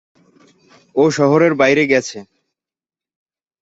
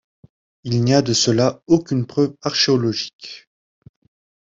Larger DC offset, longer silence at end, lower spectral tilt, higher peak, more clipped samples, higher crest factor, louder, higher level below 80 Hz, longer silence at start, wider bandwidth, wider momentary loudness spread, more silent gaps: neither; first, 1.4 s vs 1 s; about the same, -5.5 dB/octave vs -5 dB/octave; about the same, -2 dBFS vs -2 dBFS; neither; about the same, 16 dB vs 18 dB; first, -14 LUFS vs -18 LUFS; about the same, -60 dBFS vs -56 dBFS; first, 0.95 s vs 0.65 s; about the same, 8 kHz vs 8 kHz; second, 14 LU vs 19 LU; second, none vs 3.13-3.19 s